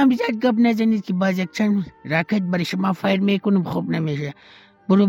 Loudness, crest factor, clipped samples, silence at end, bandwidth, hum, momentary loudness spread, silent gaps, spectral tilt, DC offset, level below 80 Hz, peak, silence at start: -21 LUFS; 14 dB; under 0.1%; 0 s; 15.5 kHz; none; 6 LU; none; -7 dB/octave; under 0.1%; -62 dBFS; -6 dBFS; 0 s